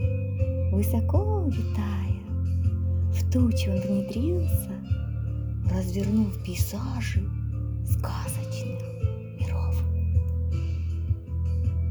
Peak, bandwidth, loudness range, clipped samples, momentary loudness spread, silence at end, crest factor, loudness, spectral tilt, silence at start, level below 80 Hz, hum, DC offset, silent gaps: -12 dBFS; over 20 kHz; 3 LU; under 0.1%; 6 LU; 0 s; 14 dB; -28 LUFS; -7.5 dB/octave; 0 s; -36 dBFS; none; under 0.1%; none